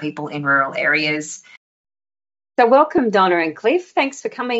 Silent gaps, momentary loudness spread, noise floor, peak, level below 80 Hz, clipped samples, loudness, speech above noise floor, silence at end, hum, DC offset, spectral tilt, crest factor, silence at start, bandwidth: 1.57-1.84 s; 12 LU; under -90 dBFS; -2 dBFS; -64 dBFS; under 0.1%; -17 LUFS; over 72 dB; 0 s; none; under 0.1%; -2.5 dB/octave; 16 dB; 0 s; 8 kHz